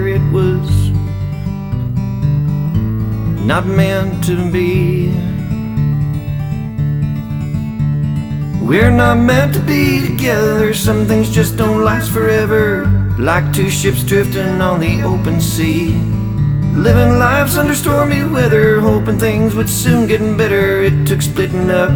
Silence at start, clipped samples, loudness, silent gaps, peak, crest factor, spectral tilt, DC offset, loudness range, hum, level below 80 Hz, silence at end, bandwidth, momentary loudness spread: 0 s; under 0.1%; -14 LUFS; none; 0 dBFS; 12 dB; -6.5 dB/octave; under 0.1%; 4 LU; none; -28 dBFS; 0 s; over 20 kHz; 8 LU